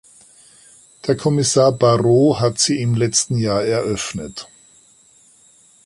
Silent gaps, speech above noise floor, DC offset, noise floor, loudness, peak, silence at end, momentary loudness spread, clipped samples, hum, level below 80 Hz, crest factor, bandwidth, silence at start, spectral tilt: none; 35 dB; under 0.1%; -52 dBFS; -17 LUFS; -2 dBFS; 1.45 s; 13 LU; under 0.1%; none; -50 dBFS; 16 dB; 11.5 kHz; 1.05 s; -5 dB/octave